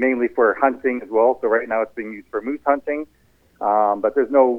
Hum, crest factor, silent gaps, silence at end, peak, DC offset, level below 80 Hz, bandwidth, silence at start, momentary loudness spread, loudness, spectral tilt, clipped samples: none; 16 dB; none; 0 s; -2 dBFS; under 0.1%; -60 dBFS; 3.4 kHz; 0 s; 11 LU; -20 LUFS; -8 dB/octave; under 0.1%